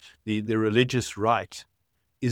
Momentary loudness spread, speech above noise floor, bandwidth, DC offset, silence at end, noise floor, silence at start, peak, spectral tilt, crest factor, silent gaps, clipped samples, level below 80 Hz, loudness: 13 LU; 50 dB; 16.5 kHz; under 0.1%; 0 s; -75 dBFS; 0.05 s; -6 dBFS; -5.5 dB/octave; 20 dB; none; under 0.1%; -60 dBFS; -26 LUFS